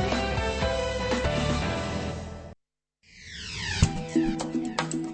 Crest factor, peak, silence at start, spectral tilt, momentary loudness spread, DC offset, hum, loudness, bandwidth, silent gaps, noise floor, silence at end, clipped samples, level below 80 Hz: 22 dB; -6 dBFS; 0 s; -5 dB/octave; 14 LU; under 0.1%; none; -28 LUFS; 8.8 kHz; none; -75 dBFS; 0 s; under 0.1%; -38 dBFS